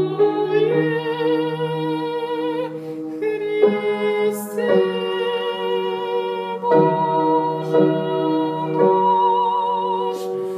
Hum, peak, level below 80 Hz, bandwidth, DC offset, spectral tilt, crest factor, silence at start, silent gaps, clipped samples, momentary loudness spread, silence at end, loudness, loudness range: none; -4 dBFS; -78 dBFS; 15.5 kHz; under 0.1%; -6.5 dB/octave; 16 dB; 0 s; none; under 0.1%; 8 LU; 0 s; -20 LUFS; 4 LU